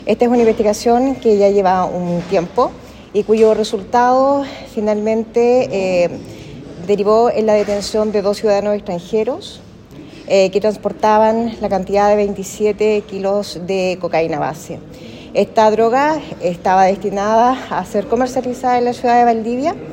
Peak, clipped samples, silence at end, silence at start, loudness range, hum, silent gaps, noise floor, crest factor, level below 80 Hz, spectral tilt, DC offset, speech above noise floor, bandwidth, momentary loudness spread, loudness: 0 dBFS; under 0.1%; 0 s; 0 s; 3 LU; none; none; -36 dBFS; 16 dB; -46 dBFS; -5.5 dB/octave; under 0.1%; 22 dB; 16.5 kHz; 9 LU; -15 LUFS